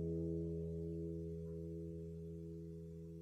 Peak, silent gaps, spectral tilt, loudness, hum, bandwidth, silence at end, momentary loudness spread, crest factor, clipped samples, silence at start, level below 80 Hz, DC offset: -32 dBFS; none; -11 dB/octave; -47 LUFS; none; 6.4 kHz; 0 s; 9 LU; 12 dB; under 0.1%; 0 s; -58 dBFS; under 0.1%